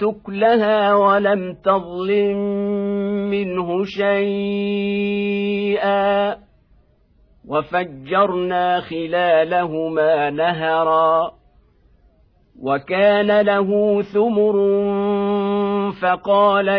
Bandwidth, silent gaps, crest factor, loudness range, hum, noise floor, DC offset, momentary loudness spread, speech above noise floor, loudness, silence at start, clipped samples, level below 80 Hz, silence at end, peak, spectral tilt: 5.4 kHz; none; 14 dB; 4 LU; none; -55 dBFS; under 0.1%; 7 LU; 38 dB; -18 LUFS; 0 s; under 0.1%; -56 dBFS; 0 s; -4 dBFS; -8.5 dB/octave